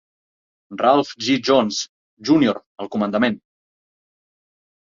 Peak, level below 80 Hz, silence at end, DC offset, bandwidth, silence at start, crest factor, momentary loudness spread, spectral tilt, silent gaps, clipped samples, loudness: -2 dBFS; -62 dBFS; 1.45 s; under 0.1%; 7.6 kHz; 0.7 s; 20 dB; 14 LU; -4.5 dB/octave; 1.89-2.17 s, 2.66-2.76 s; under 0.1%; -19 LUFS